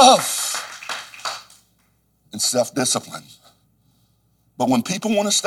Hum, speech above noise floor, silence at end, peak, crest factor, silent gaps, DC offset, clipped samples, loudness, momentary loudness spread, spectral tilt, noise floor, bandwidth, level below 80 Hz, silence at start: none; 42 dB; 0 s; 0 dBFS; 22 dB; none; under 0.1%; under 0.1%; -21 LUFS; 16 LU; -2.5 dB/octave; -63 dBFS; 19 kHz; -68 dBFS; 0 s